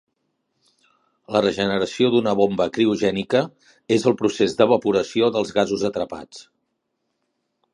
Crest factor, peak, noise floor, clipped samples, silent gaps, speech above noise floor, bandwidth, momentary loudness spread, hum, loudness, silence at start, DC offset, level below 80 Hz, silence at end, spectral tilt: 20 dB; -2 dBFS; -75 dBFS; under 0.1%; none; 55 dB; 11 kHz; 7 LU; none; -20 LUFS; 1.3 s; under 0.1%; -58 dBFS; 1.35 s; -5.5 dB/octave